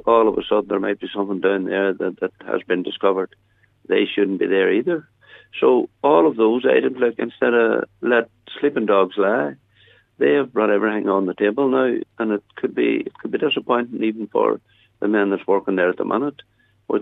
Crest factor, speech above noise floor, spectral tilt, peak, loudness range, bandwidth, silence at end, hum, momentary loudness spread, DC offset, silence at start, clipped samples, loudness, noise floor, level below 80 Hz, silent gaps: 18 dB; 35 dB; -8 dB/octave; -2 dBFS; 4 LU; 4 kHz; 0 s; none; 8 LU; under 0.1%; 0.05 s; under 0.1%; -20 LUFS; -55 dBFS; -64 dBFS; none